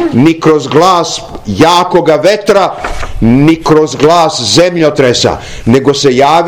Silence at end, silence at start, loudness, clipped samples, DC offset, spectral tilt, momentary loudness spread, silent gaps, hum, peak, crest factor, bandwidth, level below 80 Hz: 0 s; 0 s; -8 LUFS; 7%; under 0.1%; -5 dB/octave; 7 LU; none; none; 0 dBFS; 8 dB; 18 kHz; -28 dBFS